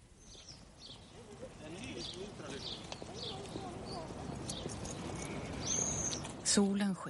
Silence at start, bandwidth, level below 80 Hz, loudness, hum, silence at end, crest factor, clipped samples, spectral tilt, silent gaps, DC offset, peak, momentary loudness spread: 0 s; 11.5 kHz; -58 dBFS; -38 LUFS; none; 0 s; 22 dB; under 0.1%; -3.5 dB/octave; none; under 0.1%; -18 dBFS; 20 LU